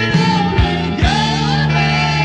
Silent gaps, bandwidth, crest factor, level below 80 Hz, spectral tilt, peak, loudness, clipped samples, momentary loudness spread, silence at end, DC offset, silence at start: none; 9.2 kHz; 14 dB; -26 dBFS; -5.5 dB/octave; -2 dBFS; -14 LUFS; under 0.1%; 2 LU; 0 s; under 0.1%; 0 s